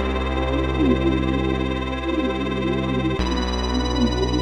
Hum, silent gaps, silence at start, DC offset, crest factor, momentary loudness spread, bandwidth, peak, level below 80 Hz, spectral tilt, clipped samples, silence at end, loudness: none; none; 0 s; under 0.1%; 14 dB; 4 LU; 9.4 kHz; -6 dBFS; -28 dBFS; -6.5 dB/octave; under 0.1%; 0 s; -22 LUFS